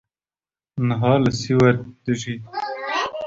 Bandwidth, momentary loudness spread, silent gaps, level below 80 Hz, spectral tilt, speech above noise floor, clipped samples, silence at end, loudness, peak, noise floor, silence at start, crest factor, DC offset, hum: 7.8 kHz; 12 LU; none; -52 dBFS; -6.5 dB/octave; over 71 dB; under 0.1%; 0 s; -21 LUFS; -2 dBFS; under -90 dBFS; 0.75 s; 20 dB; under 0.1%; none